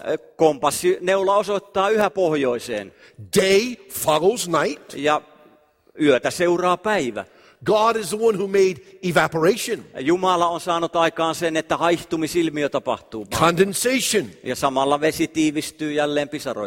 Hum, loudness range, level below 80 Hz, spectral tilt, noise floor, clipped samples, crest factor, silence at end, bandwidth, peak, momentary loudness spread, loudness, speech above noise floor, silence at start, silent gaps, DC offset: none; 1 LU; -56 dBFS; -4 dB/octave; -55 dBFS; under 0.1%; 18 dB; 0 s; 16.5 kHz; -2 dBFS; 8 LU; -21 LUFS; 35 dB; 0 s; none; under 0.1%